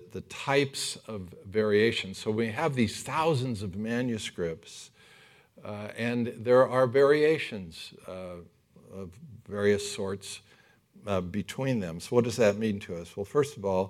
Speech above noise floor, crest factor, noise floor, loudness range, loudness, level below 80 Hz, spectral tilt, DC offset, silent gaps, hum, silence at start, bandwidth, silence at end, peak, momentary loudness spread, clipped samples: 31 dB; 20 dB; -60 dBFS; 7 LU; -28 LUFS; -68 dBFS; -5.5 dB/octave; under 0.1%; none; none; 0 s; 15 kHz; 0 s; -8 dBFS; 19 LU; under 0.1%